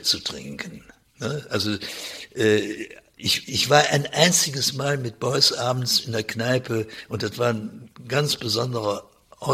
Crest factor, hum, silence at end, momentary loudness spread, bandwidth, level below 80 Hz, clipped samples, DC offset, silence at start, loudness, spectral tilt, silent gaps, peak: 24 dB; none; 0 s; 15 LU; 16 kHz; -60 dBFS; under 0.1%; under 0.1%; 0 s; -22 LUFS; -3 dB/octave; none; 0 dBFS